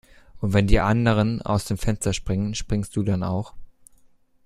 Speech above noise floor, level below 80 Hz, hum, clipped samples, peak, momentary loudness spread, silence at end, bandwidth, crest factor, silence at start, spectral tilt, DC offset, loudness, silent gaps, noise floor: 35 dB; -32 dBFS; none; under 0.1%; -2 dBFS; 8 LU; 0.75 s; 13.5 kHz; 22 dB; 0.35 s; -6 dB/octave; under 0.1%; -24 LUFS; none; -56 dBFS